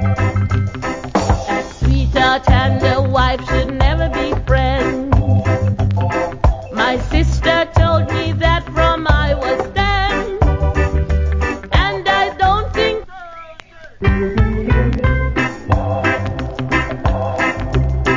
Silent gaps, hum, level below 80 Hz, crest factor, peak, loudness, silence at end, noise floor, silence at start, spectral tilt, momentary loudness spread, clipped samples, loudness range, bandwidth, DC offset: none; none; -20 dBFS; 16 dB; 0 dBFS; -16 LUFS; 0 s; -37 dBFS; 0 s; -6.5 dB/octave; 5 LU; under 0.1%; 2 LU; 7.6 kHz; under 0.1%